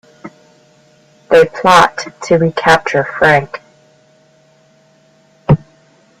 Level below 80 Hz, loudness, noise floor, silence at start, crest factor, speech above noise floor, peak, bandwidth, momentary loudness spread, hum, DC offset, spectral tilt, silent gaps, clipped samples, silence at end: -44 dBFS; -12 LUFS; -50 dBFS; 0.25 s; 14 dB; 39 dB; 0 dBFS; 15.5 kHz; 16 LU; none; under 0.1%; -5.5 dB/octave; none; under 0.1%; 0.65 s